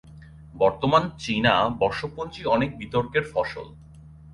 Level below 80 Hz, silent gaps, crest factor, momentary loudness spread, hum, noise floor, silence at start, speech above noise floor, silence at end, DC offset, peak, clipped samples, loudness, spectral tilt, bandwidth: -48 dBFS; none; 20 dB; 11 LU; none; -46 dBFS; 0.05 s; 23 dB; 0 s; under 0.1%; -6 dBFS; under 0.1%; -24 LUFS; -6 dB/octave; 11.5 kHz